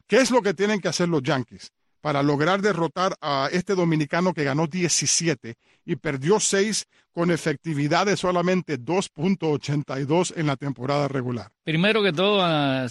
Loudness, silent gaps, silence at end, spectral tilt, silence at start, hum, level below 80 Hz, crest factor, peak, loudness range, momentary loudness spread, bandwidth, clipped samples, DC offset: -23 LUFS; none; 0 s; -4.5 dB/octave; 0.1 s; none; -60 dBFS; 16 dB; -6 dBFS; 2 LU; 8 LU; 12.5 kHz; under 0.1%; under 0.1%